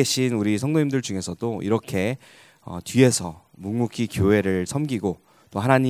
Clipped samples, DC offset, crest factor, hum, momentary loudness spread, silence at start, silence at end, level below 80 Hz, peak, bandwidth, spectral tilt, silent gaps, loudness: under 0.1%; under 0.1%; 22 dB; none; 16 LU; 0 s; 0 s; -46 dBFS; 0 dBFS; 16 kHz; -5.5 dB/octave; none; -23 LUFS